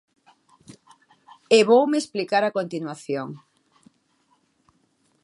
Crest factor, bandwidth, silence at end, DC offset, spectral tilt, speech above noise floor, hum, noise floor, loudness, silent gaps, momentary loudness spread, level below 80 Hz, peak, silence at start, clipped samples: 22 dB; 11.5 kHz; 1.85 s; under 0.1%; -4.5 dB/octave; 45 dB; none; -66 dBFS; -21 LUFS; none; 16 LU; -78 dBFS; -4 dBFS; 1.5 s; under 0.1%